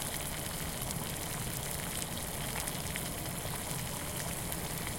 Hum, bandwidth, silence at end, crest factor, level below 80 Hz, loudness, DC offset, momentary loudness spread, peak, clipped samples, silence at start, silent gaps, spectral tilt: none; 17 kHz; 0 s; 24 dB; -48 dBFS; -36 LUFS; under 0.1%; 1 LU; -14 dBFS; under 0.1%; 0 s; none; -3 dB/octave